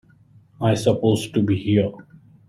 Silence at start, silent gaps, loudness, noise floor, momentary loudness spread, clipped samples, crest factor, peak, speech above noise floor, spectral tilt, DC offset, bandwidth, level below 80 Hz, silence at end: 0.6 s; none; -21 LUFS; -53 dBFS; 4 LU; under 0.1%; 16 dB; -4 dBFS; 33 dB; -7 dB/octave; under 0.1%; 14.5 kHz; -54 dBFS; 0.45 s